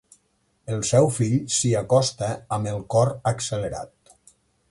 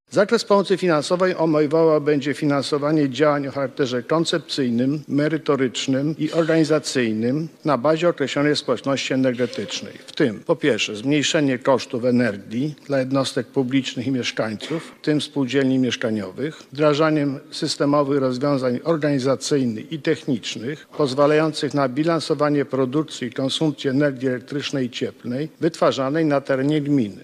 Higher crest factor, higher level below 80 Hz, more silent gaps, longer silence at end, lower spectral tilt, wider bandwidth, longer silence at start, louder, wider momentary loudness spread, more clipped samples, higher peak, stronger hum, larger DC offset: about the same, 18 dB vs 16 dB; first, -52 dBFS vs -66 dBFS; neither; first, 0.85 s vs 0 s; about the same, -5 dB/octave vs -5.5 dB/octave; about the same, 11.5 kHz vs 12.5 kHz; first, 0.65 s vs 0.1 s; about the same, -23 LUFS vs -21 LUFS; first, 12 LU vs 8 LU; neither; about the same, -6 dBFS vs -4 dBFS; neither; neither